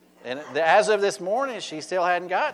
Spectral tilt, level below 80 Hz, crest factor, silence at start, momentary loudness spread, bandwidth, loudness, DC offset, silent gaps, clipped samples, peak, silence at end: -3 dB/octave; -78 dBFS; 18 dB; 0.25 s; 13 LU; 12.5 kHz; -23 LUFS; under 0.1%; none; under 0.1%; -6 dBFS; 0 s